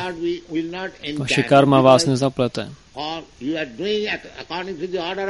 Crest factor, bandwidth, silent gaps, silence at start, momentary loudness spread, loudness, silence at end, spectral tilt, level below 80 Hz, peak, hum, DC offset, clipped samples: 20 dB; 11.5 kHz; none; 0 s; 16 LU; -20 LUFS; 0 s; -5.5 dB/octave; -52 dBFS; 0 dBFS; none; 0.1%; under 0.1%